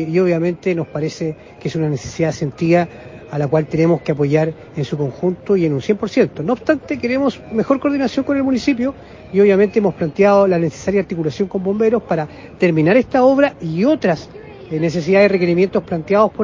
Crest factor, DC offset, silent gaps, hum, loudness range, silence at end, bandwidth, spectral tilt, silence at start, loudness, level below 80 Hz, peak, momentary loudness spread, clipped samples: 16 dB; under 0.1%; none; none; 3 LU; 0 s; 7.6 kHz; -7.5 dB/octave; 0 s; -17 LUFS; -48 dBFS; 0 dBFS; 10 LU; under 0.1%